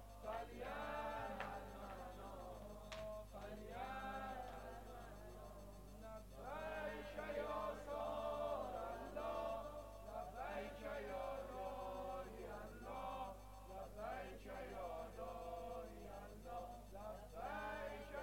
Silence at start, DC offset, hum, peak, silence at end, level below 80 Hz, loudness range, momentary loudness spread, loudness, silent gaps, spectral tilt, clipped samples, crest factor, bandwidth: 0 s; under 0.1%; none; -32 dBFS; 0 s; -60 dBFS; 5 LU; 10 LU; -50 LUFS; none; -5.5 dB/octave; under 0.1%; 18 dB; 16.5 kHz